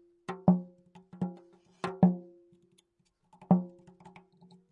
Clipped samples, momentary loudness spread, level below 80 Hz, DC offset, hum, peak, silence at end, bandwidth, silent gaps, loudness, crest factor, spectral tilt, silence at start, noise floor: under 0.1%; 16 LU; -72 dBFS; under 0.1%; none; -10 dBFS; 1.05 s; 4.8 kHz; none; -30 LUFS; 22 dB; -10 dB/octave; 0.3 s; -75 dBFS